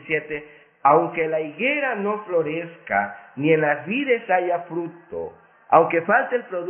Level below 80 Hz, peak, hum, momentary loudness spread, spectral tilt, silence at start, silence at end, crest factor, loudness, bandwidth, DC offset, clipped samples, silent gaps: -64 dBFS; -2 dBFS; none; 15 LU; -10.5 dB/octave; 0.05 s; 0 s; 22 dB; -21 LUFS; 3.4 kHz; under 0.1%; under 0.1%; none